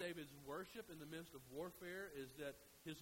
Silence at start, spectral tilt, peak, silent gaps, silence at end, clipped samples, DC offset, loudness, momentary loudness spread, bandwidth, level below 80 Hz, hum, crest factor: 0 s; -4.5 dB/octave; -36 dBFS; none; 0 s; under 0.1%; under 0.1%; -53 LUFS; 4 LU; 16 kHz; -76 dBFS; none; 16 dB